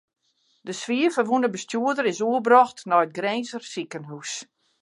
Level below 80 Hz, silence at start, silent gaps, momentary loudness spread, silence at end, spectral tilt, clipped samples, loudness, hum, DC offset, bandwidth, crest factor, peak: -80 dBFS; 0.65 s; none; 17 LU; 0.4 s; -4 dB/octave; under 0.1%; -23 LUFS; none; under 0.1%; 11.5 kHz; 20 dB; -4 dBFS